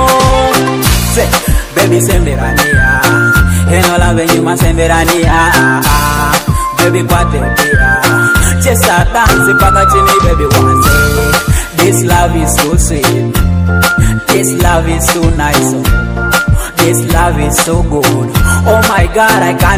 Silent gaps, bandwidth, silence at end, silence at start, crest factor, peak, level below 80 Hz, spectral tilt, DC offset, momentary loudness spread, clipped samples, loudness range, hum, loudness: none; over 20 kHz; 0 s; 0 s; 8 dB; 0 dBFS; -16 dBFS; -4.5 dB/octave; under 0.1%; 4 LU; 0.7%; 3 LU; none; -9 LUFS